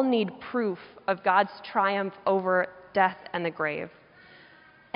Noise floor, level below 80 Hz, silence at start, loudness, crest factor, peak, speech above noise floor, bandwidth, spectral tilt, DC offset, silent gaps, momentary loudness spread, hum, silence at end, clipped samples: -55 dBFS; -72 dBFS; 0 s; -27 LUFS; 20 dB; -8 dBFS; 28 dB; 5.4 kHz; -3.5 dB/octave; under 0.1%; none; 8 LU; none; 1.1 s; under 0.1%